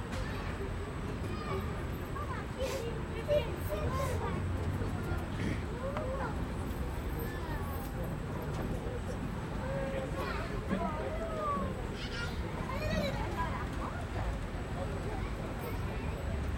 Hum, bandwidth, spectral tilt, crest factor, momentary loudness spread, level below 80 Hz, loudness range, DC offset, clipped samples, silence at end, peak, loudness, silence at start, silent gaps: none; 16.5 kHz; -6.5 dB/octave; 18 dB; 4 LU; -42 dBFS; 2 LU; under 0.1%; under 0.1%; 0 s; -18 dBFS; -37 LUFS; 0 s; none